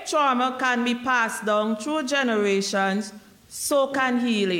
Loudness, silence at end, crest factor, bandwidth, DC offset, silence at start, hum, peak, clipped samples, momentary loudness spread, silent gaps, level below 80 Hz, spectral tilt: -23 LUFS; 0 s; 12 dB; 16.5 kHz; under 0.1%; 0 s; none; -10 dBFS; under 0.1%; 5 LU; none; -68 dBFS; -3.5 dB/octave